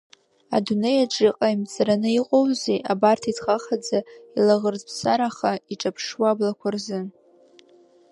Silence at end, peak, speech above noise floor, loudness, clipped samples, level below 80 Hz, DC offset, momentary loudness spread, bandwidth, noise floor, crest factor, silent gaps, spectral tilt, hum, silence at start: 1 s; -4 dBFS; 33 dB; -23 LUFS; under 0.1%; -68 dBFS; under 0.1%; 8 LU; 11.5 kHz; -55 dBFS; 18 dB; none; -5 dB/octave; none; 0.5 s